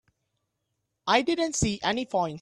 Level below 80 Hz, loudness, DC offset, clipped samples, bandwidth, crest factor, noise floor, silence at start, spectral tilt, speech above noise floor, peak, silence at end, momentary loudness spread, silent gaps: -50 dBFS; -26 LUFS; under 0.1%; under 0.1%; 12 kHz; 20 dB; -80 dBFS; 1.05 s; -3.5 dB/octave; 54 dB; -8 dBFS; 0 s; 5 LU; none